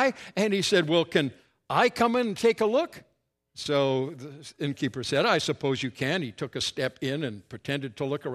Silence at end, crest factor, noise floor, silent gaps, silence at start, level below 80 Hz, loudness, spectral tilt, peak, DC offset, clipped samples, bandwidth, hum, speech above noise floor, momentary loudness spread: 0 s; 20 dB; -63 dBFS; none; 0 s; -66 dBFS; -27 LUFS; -4.5 dB/octave; -8 dBFS; under 0.1%; under 0.1%; 14 kHz; none; 36 dB; 12 LU